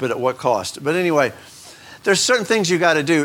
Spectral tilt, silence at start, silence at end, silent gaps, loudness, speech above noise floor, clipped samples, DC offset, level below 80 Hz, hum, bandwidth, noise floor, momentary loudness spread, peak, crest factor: -3.5 dB/octave; 0 s; 0 s; none; -18 LUFS; 23 dB; under 0.1%; under 0.1%; -62 dBFS; none; 17 kHz; -41 dBFS; 7 LU; -2 dBFS; 18 dB